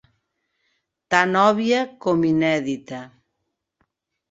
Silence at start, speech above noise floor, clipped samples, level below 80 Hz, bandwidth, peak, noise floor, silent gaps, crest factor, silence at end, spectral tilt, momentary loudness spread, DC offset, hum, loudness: 1.1 s; 58 dB; under 0.1%; -64 dBFS; 8 kHz; -2 dBFS; -78 dBFS; none; 22 dB; 1.25 s; -5.5 dB/octave; 13 LU; under 0.1%; none; -20 LUFS